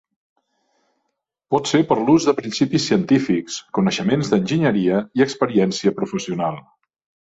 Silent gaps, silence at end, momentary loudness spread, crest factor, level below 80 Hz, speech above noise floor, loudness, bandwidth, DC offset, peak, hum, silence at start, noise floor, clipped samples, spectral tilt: none; 0.6 s; 8 LU; 16 dB; -58 dBFS; 58 dB; -19 LUFS; 8 kHz; under 0.1%; -4 dBFS; none; 1.5 s; -76 dBFS; under 0.1%; -5.5 dB/octave